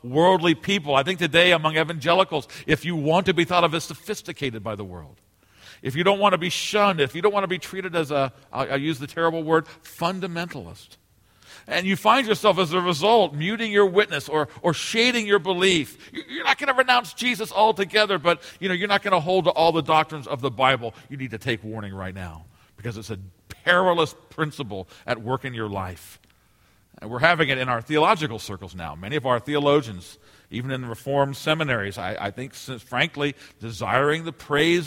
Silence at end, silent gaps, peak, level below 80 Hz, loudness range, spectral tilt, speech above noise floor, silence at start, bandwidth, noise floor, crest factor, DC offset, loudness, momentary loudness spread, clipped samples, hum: 0 s; none; 0 dBFS; -58 dBFS; 6 LU; -4.5 dB/octave; 37 dB; 0.05 s; 16.5 kHz; -60 dBFS; 24 dB; under 0.1%; -22 LUFS; 16 LU; under 0.1%; none